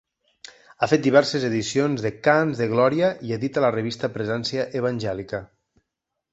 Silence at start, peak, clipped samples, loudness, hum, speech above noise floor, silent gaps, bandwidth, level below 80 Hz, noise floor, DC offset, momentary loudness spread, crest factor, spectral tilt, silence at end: 0.8 s; -2 dBFS; under 0.1%; -22 LUFS; none; 60 dB; none; 8.2 kHz; -58 dBFS; -82 dBFS; under 0.1%; 9 LU; 20 dB; -5.5 dB/octave; 0.9 s